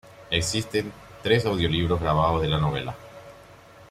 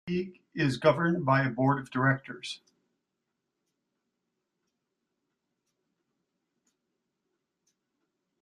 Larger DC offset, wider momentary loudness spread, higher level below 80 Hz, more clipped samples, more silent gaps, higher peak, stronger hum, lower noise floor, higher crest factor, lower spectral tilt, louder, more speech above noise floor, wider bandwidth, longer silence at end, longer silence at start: neither; about the same, 15 LU vs 14 LU; first, -44 dBFS vs -70 dBFS; neither; neither; about the same, -8 dBFS vs -8 dBFS; neither; second, -49 dBFS vs -84 dBFS; second, 18 dB vs 24 dB; second, -5 dB/octave vs -7 dB/octave; first, -24 LUFS vs -27 LUFS; second, 25 dB vs 56 dB; first, 15 kHz vs 11.5 kHz; second, 0.05 s vs 5.85 s; about the same, 0.05 s vs 0.05 s